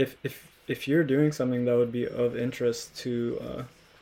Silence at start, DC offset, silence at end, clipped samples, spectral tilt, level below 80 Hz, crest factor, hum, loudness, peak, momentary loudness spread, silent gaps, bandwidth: 0 s; under 0.1%; 0.35 s; under 0.1%; -6.5 dB/octave; -60 dBFS; 16 dB; none; -28 LUFS; -12 dBFS; 13 LU; none; 17 kHz